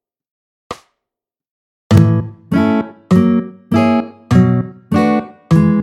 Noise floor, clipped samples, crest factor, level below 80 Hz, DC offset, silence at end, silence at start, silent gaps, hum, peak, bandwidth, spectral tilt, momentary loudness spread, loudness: -84 dBFS; under 0.1%; 14 dB; -40 dBFS; under 0.1%; 0 s; 0.7 s; 1.50-1.90 s; none; 0 dBFS; 12.5 kHz; -8.5 dB/octave; 7 LU; -14 LUFS